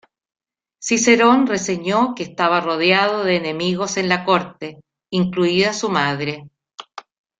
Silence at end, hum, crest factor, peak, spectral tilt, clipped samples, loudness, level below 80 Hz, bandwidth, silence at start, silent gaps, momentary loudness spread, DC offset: 0.4 s; none; 18 dB; -2 dBFS; -4 dB/octave; under 0.1%; -18 LUFS; -60 dBFS; 9.4 kHz; 0.8 s; none; 17 LU; under 0.1%